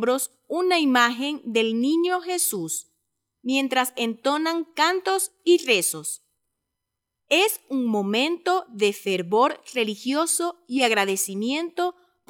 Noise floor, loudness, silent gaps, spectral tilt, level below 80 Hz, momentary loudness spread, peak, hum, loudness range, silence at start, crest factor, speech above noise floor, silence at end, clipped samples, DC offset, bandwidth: -83 dBFS; -23 LUFS; none; -2.5 dB/octave; -84 dBFS; 8 LU; -6 dBFS; none; 2 LU; 0 s; 18 dB; 59 dB; 0.4 s; under 0.1%; under 0.1%; 18.5 kHz